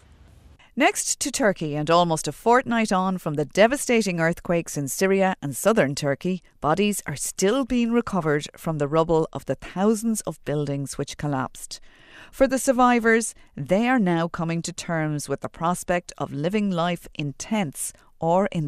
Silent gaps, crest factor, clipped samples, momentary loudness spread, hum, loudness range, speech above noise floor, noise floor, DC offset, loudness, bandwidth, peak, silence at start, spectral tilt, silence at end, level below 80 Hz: none; 20 dB; under 0.1%; 10 LU; none; 5 LU; 28 dB; -51 dBFS; under 0.1%; -23 LUFS; 15 kHz; -4 dBFS; 0.75 s; -4.5 dB/octave; 0 s; -50 dBFS